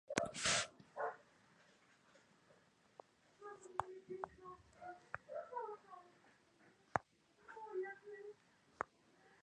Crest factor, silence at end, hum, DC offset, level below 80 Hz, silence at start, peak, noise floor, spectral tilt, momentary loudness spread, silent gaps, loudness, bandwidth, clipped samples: 34 dB; 0.05 s; none; under 0.1%; -76 dBFS; 0.1 s; -16 dBFS; -72 dBFS; -2 dB/octave; 23 LU; none; -45 LUFS; 10.5 kHz; under 0.1%